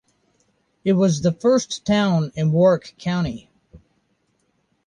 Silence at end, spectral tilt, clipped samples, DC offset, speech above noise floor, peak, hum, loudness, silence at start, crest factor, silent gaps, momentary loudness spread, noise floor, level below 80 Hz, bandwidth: 1.1 s; -6.5 dB/octave; under 0.1%; under 0.1%; 49 dB; -6 dBFS; none; -20 LUFS; 0.85 s; 16 dB; none; 9 LU; -68 dBFS; -52 dBFS; 10 kHz